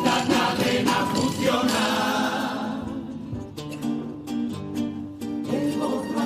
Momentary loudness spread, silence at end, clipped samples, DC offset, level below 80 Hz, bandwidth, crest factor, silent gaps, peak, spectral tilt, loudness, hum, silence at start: 12 LU; 0 s; under 0.1%; under 0.1%; -56 dBFS; 15.5 kHz; 18 dB; none; -8 dBFS; -4.5 dB/octave; -25 LUFS; none; 0 s